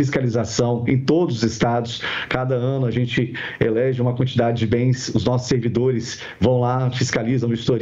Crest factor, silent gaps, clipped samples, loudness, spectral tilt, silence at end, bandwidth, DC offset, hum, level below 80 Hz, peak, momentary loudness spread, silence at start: 16 dB; none; under 0.1%; -20 LUFS; -6 dB/octave; 0 s; 7.8 kHz; under 0.1%; none; -48 dBFS; -2 dBFS; 4 LU; 0 s